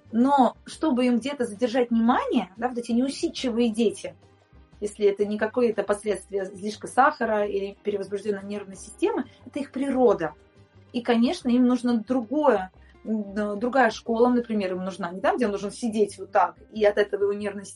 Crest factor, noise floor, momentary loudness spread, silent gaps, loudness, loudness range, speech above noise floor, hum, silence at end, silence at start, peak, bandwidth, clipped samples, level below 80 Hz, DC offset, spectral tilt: 20 dB; -54 dBFS; 10 LU; none; -25 LUFS; 3 LU; 30 dB; none; 0 s; 0.1 s; -4 dBFS; 11.5 kHz; under 0.1%; -58 dBFS; under 0.1%; -5.5 dB/octave